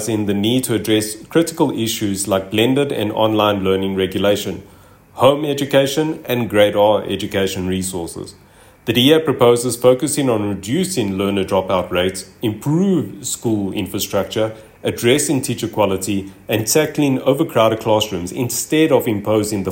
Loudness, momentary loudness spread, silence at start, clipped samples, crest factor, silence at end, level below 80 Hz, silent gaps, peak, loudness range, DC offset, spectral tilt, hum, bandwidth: -17 LUFS; 8 LU; 0 s; under 0.1%; 16 dB; 0 s; -54 dBFS; none; 0 dBFS; 3 LU; under 0.1%; -4.5 dB/octave; none; 16.5 kHz